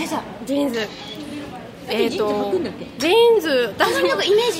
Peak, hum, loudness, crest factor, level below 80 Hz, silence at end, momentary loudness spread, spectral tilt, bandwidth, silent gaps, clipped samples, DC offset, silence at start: -2 dBFS; none; -19 LUFS; 18 dB; -54 dBFS; 0 s; 17 LU; -3.5 dB/octave; 16 kHz; none; under 0.1%; under 0.1%; 0 s